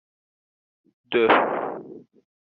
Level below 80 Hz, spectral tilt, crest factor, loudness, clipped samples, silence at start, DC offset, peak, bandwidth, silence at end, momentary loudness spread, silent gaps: -72 dBFS; -1.5 dB/octave; 22 dB; -22 LUFS; under 0.1%; 1.1 s; under 0.1%; -4 dBFS; 5.2 kHz; 0.4 s; 20 LU; none